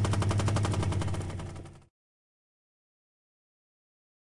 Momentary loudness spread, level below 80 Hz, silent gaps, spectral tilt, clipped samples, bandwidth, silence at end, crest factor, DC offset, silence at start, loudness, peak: 16 LU; -48 dBFS; none; -6 dB/octave; under 0.1%; 11.5 kHz; 2.6 s; 16 dB; under 0.1%; 0 s; -31 LUFS; -18 dBFS